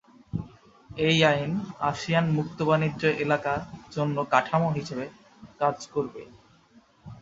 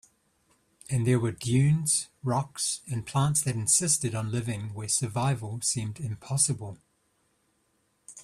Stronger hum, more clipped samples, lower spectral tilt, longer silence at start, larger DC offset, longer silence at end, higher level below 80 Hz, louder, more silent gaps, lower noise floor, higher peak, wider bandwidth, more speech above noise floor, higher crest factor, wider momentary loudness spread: neither; neither; first, -6 dB/octave vs -4 dB/octave; second, 0.35 s vs 0.9 s; neither; about the same, 0 s vs 0 s; about the same, -58 dBFS vs -60 dBFS; about the same, -26 LUFS vs -27 LUFS; neither; second, -58 dBFS vs -72 dBFS; first, -4 dBFS vs -10 dBFS; second, 7.8 kHz vs 14.5 kHz; second, 33 dB vs 44 dB; about the same, 22 dB vs 18 dB; first, 14 LU vs 10 LU